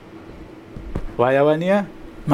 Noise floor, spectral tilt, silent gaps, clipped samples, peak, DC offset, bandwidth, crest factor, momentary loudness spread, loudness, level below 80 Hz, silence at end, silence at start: -39 dBFS; -7.5 dB/octave; none; under 0.1%; -2 dBFS; under 0.1%; 11 kHz; 18 dB; 23 LU; -19 LUFS; -38 dBFS; 0 s; 0 s